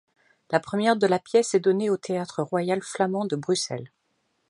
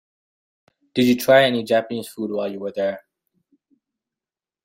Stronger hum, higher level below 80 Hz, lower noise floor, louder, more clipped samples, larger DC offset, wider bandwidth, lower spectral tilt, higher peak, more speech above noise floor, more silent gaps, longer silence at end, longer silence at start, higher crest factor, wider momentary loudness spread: neither; second, -72 dBFS vs -66 dBFS; second, -73 dBFS vs under -90 dBFS; second, -25 LUFS vs -20 LUFS; neither; neither; second, 11.5 kHz vs 16 kHz; about the same, -5 dB/octave vs -5 dB/octave; about the same, -4 dBFS vs -2 dBFS; second, 48 dB vs over 71 dB; neither; second, 0.6 s vs 1.65 s; second, 0.5 s vs 0.95 s; about the same, 20 dB vs 20 dB; second, 7 LU vs 13 LU